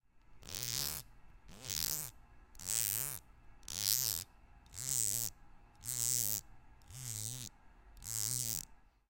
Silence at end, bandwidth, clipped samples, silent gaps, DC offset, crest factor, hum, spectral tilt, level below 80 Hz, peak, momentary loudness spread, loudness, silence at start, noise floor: 0.35 s; 17 kHz; under 0.1%; none; under 0.1%; 30 dB; none; -0.5 dB/octave; -60 dBFS; -10 dBFS; 17 LU; -36 LUFS; 0.15 s; -60 dBFS